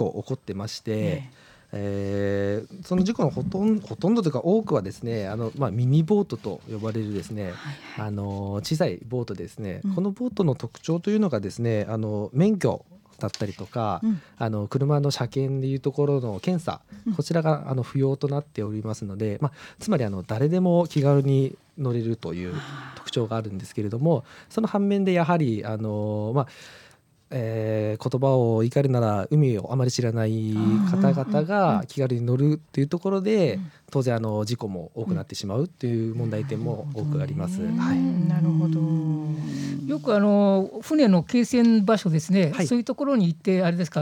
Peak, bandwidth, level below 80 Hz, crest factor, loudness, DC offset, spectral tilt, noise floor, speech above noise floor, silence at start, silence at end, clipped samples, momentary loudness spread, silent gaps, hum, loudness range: -6 dBFS; 15.5 kHz; -60 dBFS; 18 dB; -25 LUFS; under 0.1%; -7.5 dB/octave; -53 dBFS; 29 dB; 0 s; 0 s; under 0.1%; 10 LU; none; none; 6 LU